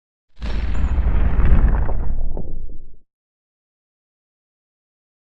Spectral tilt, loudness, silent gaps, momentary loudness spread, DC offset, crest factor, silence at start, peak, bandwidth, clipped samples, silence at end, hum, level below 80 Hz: -9 dB/octave; -22 LUFS; none; 16 LU; under 0.1%; 16 dB; 0.3 s; -2 dBFS; 4.6 kHz; under 0.1%; 2.1 s; none; -20 dBFS